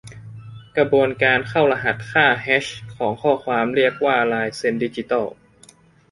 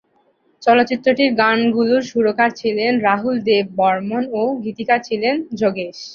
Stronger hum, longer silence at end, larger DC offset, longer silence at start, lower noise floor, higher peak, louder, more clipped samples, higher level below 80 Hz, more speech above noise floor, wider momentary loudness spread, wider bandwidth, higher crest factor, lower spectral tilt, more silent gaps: neither; first, 0.8 s vs 0 s; neither; second, 0.05 s vs 0.6 s; second, -51 dBFS vs -60 dBFS; about the same, -2 dBFS vs 0 dBFS; about the same, -19 LUFS vs -17 LUFS; neither; first, -56 dBFS vs -62 dBFS; second, 32 dB vs 43 dB; first, 13 LU vs 6 LU; first, 11.5 kHz vs 7 kHz; about the same, 18 dB vs 16 dB; about the same, -5.5 dB/octave vs -5.5 dB/octave; neither